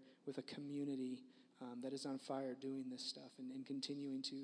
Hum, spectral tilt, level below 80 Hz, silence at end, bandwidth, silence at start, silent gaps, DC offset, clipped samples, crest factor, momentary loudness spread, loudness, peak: none; -4.5 dB/octave; under -90 dBFS; 0 s; 10.5 kHz; 0 s; none; under 0.1%; under 0.1%; 18 dB; 7 LU; -48 LUFS; -30 dBFS